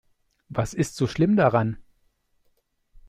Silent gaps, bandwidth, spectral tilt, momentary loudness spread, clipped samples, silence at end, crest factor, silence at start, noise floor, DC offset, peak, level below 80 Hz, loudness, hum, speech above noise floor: none; 14.5 kHz; -7 dB/octave; 12 LU; under 0.1%; 1.25 s; 20 dB; 0.5 s; -68 dBFS; under 0.1%; -6 dBFS; -52 dBFS; -24 LUFS; none; 46 dB